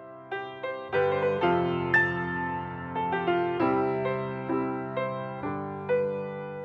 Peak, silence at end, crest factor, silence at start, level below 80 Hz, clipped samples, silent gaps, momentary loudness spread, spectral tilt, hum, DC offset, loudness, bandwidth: -10 dBFS; 0 s; 18 dB; 0 s; -60 dBFS; under 0.1%; none; 10 LU; -8.5 dB/octave; none; under 0.1%; -28 LUFS; 6.8 kHz